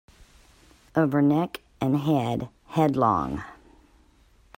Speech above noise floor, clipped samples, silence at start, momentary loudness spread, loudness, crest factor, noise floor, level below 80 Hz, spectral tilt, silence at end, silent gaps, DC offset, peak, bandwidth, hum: 35 dB; under 0.1%; 0.95 s; 11 LU; -25 LUFS; 20 dB; -58 dBFS; -54 dBFS; -8 dB/octave; 1.05 s; none; under 0.1%; -8 dBFS; 16 kHz; none